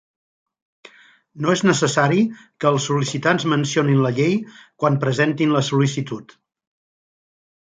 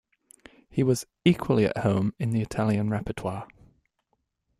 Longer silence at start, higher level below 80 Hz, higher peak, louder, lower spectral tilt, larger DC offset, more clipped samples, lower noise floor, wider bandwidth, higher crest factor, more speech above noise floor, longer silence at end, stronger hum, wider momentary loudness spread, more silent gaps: first, 1.35 s vs 0.7 s; second, -62 dBFS vs -54 dBFS; first, -2 dBFS vs -6 dBFS; first, -19 LUFS vs -26 LUFS; second, -5.5 dB/octave vs -7 dB/octave; neither; neither; second, -48 dBFS vs -76 dBFS; second, 9.4 kHz vs 15.5 kHz; about the same, 18 dB vs 20 dB; second, 29 dB vs 51 dB; first, 1.55 s vs 1.15 s; neither; about the same, 8 LU vs 10 LU; neither